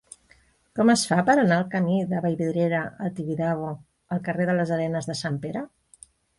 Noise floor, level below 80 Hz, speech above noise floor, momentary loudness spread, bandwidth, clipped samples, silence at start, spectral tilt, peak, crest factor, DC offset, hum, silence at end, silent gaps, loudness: -60 dBFS; -62 dBFS; 36 dB; 13 LU; 11.5 kHz; under 0.1%; 0.75 s; -5.5 dB/octave; -8 dBFS; 18 dB; under 0.1%; none; 0.7 s; none; -24 LUFS